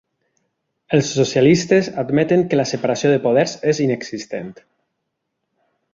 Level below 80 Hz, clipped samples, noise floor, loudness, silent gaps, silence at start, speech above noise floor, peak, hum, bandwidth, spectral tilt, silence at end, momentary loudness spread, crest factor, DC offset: -58 dBFS; under 0.1%; -76 dBFS; -17 LUFS; none; 0.9 s; 59 dB; -2 dBFS; none; 7.6 kHz; -5.5 dB/octave; 1.4 s; 13 LU; 18 dB; under 0.1%